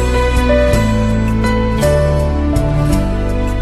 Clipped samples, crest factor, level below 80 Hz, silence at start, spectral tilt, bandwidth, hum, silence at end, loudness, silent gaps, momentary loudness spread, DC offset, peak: under 0.1%; 12 dB; -18 dBFS; 0 s; -6.5 dB/octave; 13 kHz; none; 0 s; -14 LUFS; none; 4 LU; under 0.1%; 0 dBFS